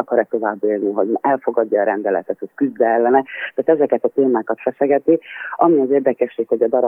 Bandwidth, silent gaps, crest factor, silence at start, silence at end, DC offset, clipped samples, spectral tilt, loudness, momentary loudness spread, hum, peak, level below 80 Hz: 3.6 kHz; none; 16 dB; 0 s; 0 s; under 0.1%; under 0.1%; -9.5 dB/octave; -18 LUFS; 6 LU; none; -2 dBFS; -74 dBFS